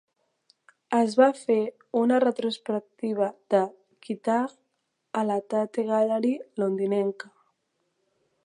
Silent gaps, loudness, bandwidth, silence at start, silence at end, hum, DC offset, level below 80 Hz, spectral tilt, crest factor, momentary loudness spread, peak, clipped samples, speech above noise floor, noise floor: none; -26 LUFS; 11 kHz; 0.9 s; 1.25 s; none; under 0.1%; -82 dBFS; -6 dB/octave; 20 dB; 10 LU; -6 dBFS; under 0.1%; 52 dB; -77 dBFS